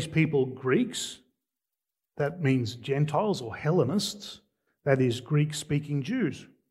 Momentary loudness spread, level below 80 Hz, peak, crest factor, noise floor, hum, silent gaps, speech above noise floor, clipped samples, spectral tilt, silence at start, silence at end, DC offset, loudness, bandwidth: 9 LU; -66 dBFS; -8 dBFS; 20 dB; -88 dBFS; none; none; 61 dB; under 0.1%; -6 dB/octave; 0 s; 0.25 s; under 0.1%; -28 LUFS; 13 kHz